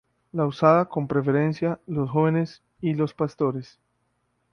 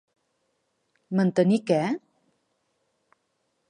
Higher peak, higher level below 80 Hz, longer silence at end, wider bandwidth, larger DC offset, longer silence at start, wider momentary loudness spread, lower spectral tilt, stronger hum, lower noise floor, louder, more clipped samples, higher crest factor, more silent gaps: first, -4 dBFS vs -10 dBFS; first, -60 dBFS vs -78 dBFS; second, 0.9 s vs 1.7 s; second, 6.6 kHz vs 10 kHz; neither; second, 0.35 s vs 1.1 s; about the same, 10 LU vs 8 LU; first, -9 dB/octave vs -7.5 dB/octave; first, 60 Hz at -60 dBFS vs none; about the same, -72 dBFS vs -75 dBFS; about the same, -24 LUFS vs -24 LUFS; neither; about the same, 20 dB vs 20 dB; neither